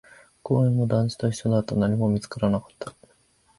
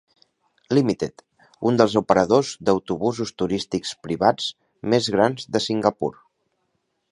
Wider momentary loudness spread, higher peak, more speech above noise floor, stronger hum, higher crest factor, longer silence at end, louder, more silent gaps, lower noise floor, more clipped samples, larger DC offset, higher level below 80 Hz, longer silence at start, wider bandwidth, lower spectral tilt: first, 18 LU vs 10 LU; second, -8 dBFS vs 0 dBFS; second, 39 dB vs 52 dB; neither; second, 16 dB vs 22 dB; second, 0.7 s vs 1 s; about the same, -24 LUFS vs -22 LUFS; neither; second, -62 dBFS vs -73 dBFS; neither; neither; about the same, -52 dBFS vs -56 dBFS; second, 0.45 s vs 0.7 s; about the same, 11.5 kHz vs 11 kHz; first, -7.5 dB/octave vs -5.5 dB/octave